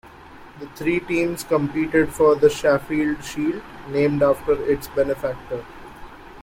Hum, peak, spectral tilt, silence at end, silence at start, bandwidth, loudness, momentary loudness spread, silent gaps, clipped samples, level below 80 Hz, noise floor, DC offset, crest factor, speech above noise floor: none; -4 dBFS; -6 dB/octave; 0 s; 0.05 s; 16.5 kHz; -21 LUFS; 22 LU; none; under 0.1%; -46 dBFS; -43 dBFS; under 0.1%; 18 dB; 22 dB